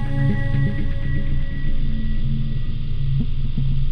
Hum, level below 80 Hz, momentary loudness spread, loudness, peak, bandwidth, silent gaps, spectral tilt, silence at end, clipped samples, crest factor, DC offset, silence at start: none; -20 dBFS; 6 LU; -25 LUFS; -8 dBFS; 4.7 kHz; none; -9 dB/octave; 0 s; under 0.1%; 10 dB; under 0.1%; 0 s